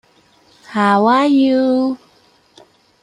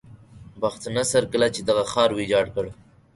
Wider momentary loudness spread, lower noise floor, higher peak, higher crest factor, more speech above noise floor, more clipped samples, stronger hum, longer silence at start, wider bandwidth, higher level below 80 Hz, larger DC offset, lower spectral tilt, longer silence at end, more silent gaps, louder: first, 11 LU vs 8 LU; first, -53 dBFS vs -45 dBFS; first, -2 dBFS vs -6 dBFS; about the same, 16 dB vs 18 dB; first, 40 dB vs 23 dB; neither; neither; first, 0.7 s vs 0.1 s; about the same, 10.5 kHz vs 11.5 kHz; second, -64 dBFS vs -52 dBFS; neither; first, -6.5 dB/octave vs -4 dB/octave; first, 1.05 s vs 0.4 s; neither; first, -14 LUFS vs -23 LUFS